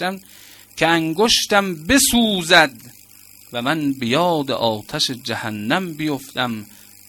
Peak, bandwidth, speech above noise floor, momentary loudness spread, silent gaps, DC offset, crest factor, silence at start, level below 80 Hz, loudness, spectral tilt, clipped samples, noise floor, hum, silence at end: 0 dBFS; 17.5 kHz; 27 dB; 12 LU; none; under 0.1%; 20 dB; 0 s; -46 dBFS; -18 LUFS; -3 dB/octave; under 0.1%; -46 dBFS; none; 0.4 s